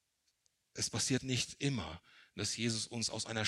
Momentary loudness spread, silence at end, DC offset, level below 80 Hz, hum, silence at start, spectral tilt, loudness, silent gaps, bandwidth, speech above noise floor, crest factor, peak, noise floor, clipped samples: 15 LU; 0 s; under 0.1%; -66 dBFS; none; 0.75 s; -3 dB/octave; -36 LUFS; none; 15 kHz; 42 dB; 20 dB; -18 dBFS; -79 dBFS; under 0.1%